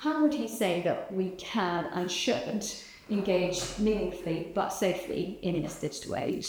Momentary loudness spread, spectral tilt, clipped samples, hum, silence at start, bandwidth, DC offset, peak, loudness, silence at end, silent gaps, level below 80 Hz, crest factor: 6 LU; -4.5 dB/octave; under 0.1%; none; 0 s; over 20 kHz; under 0.1%; -14 dBFS; -31 LUFS; 0 s; none; -54 dBFS; 16 dB